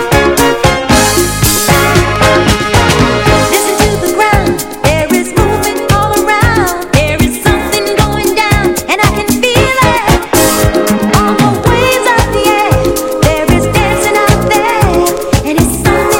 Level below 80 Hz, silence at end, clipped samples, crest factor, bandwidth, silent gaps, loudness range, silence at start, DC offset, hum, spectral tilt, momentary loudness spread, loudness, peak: -22 dBFS; 0 s; 0.6%; 10 dB; 17.5 kHz; none; 2 LU; 0 s; under 0.1%; none; -4.5 dB/octave; 3 LU; -9 LUFS; 0 dBFS